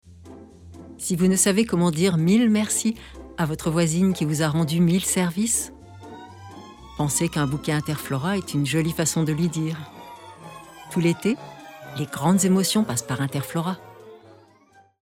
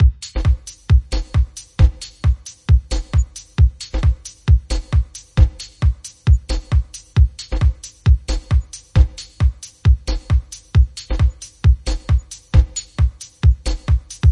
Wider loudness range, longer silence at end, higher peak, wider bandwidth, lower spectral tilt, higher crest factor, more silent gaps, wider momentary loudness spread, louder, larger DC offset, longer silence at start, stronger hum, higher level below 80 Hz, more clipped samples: first, 5 LU vs 1 LU; first, 0.85 s vs 0 s; second, -8 dBFS vs 0 dBFS; first, 17 kHz vs 11 kHz; about the same, -5 dB/octave vs -6 dB/octave; about the same, 16 dB vs 16 dB; neither; first, 23 LU vs 4 LU; second, -22 LUFS vs -19 LUFS; neither; about the same, 0.05 s vs 0 s; neither; second, -52 dBFS vs -18 dBFS; neither